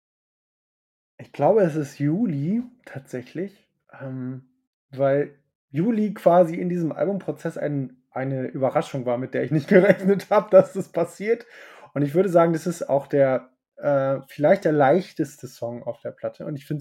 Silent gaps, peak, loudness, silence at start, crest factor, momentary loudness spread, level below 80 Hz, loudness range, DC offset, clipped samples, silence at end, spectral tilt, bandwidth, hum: 4.67-4.89 s, 5.55-5.68 s; -2 dBFS; -22 LUFS; 1.2 s; 22 dB; 16 LU; -72 dBFS; 7 LU; under 0.1%; under 0.1%; 0 s; -8 dB/octave; 13.5 kHz; none